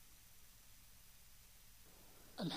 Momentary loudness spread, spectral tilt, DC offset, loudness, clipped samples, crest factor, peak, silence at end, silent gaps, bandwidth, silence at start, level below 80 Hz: 5 LU; -4.5 dB/octave; under 0.1%; -59 LUFS; under 0.1%; 22 dB; -32 dBFS; 0 s; none; 15.5 kHz; 0 s; -70 dBFS